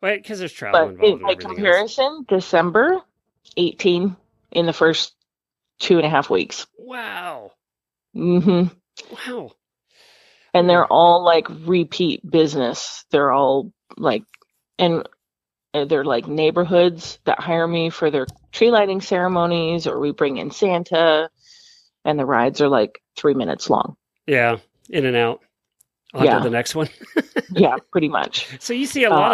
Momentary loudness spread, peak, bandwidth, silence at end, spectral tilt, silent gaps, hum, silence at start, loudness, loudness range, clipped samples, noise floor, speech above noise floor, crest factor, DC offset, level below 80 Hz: 13 LU; -2 dBFS; 13.5 kHz; 0 s; -5.5 dB/octave; none; none; 0 s; -19 LUFS; 5 LU; under 0.1%; -88 dBFS; 70 dB; 18 dB; under 0.1%; -60 dBFS